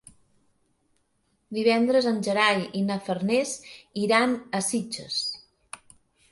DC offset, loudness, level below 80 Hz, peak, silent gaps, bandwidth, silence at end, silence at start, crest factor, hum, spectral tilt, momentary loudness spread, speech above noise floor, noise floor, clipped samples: under 0.1%; -25 LUFS; -68 dBFS; -6 dBFS; none; 11.5 kHz; 0.55 s; 1.5 s; 20 dB; none; -4 dB/octave; 18 LU; 46 dB; -71 dBFS; under 0.1%